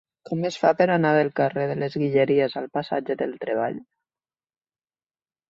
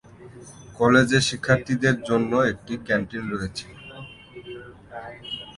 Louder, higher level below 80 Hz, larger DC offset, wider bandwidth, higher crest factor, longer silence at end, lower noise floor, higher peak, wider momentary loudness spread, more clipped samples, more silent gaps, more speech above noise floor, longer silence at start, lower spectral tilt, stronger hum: about the same, -23 LUFS vs -22 LUFS; second, -68 dBFS vs -52 dBFS; neither; second, 7.6 kHz vs 11.5 kHz; about the same, 20 dB vs 22 dB; first, 1.7 s vs 0.05 s; first, under -90 dBFS vs -42 dBFS; about the same, -6 dBFS vs -4 dBFS; second, 9 LU vs 23 LU; neither; neither; first, over 67 dB vs 20 dB; about the same, 0.3 s vs 0.2 s; first, -7 dB/octave vs -5 dB/octave; neither